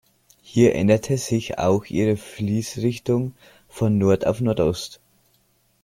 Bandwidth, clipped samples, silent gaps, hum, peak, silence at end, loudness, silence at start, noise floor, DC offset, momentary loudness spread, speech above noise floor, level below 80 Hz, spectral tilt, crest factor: 16.5 kHz; under 0.1%; none; none; -4 dBFS; 0.9 s; -22 LUFS; 0.5 s; -64 dBFS; under 0.1%; 7 LU; 43 dB; -50 dBFS; -6.5 dB/octave; 18 dB